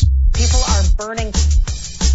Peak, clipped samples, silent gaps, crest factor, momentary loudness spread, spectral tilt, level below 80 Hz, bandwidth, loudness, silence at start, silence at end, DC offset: -2 dBFS; under 0.1%; none; 12 dB; 6 LU; -4 dB/octave; -14 dBFS; 8 kHz; -17 LUFS; 0 s; 0 s; under 0.1%